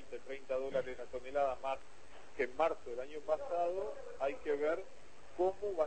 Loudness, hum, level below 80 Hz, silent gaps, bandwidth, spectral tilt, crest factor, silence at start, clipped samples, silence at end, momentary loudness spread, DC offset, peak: -39 LUFS; none; -66 dBFS; none; 8.4 kHz; -5 dB/octave; 20 dB; 0 s; under 0.1%; 0 s; 12 LU; 0.5%; -18 dBFS